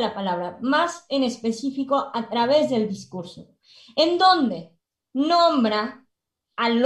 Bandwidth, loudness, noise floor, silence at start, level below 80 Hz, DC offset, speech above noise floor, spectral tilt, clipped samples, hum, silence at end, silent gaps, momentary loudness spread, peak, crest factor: 11.5 kHz; -22 LUFS; -78 dBFS; 0 s; -66 dBFS; under 0.1%; 56 dB; -4.5 dB/octave; under 0.1%; none; 0 s; none; 15 LU; -6 dBFS; 18 dB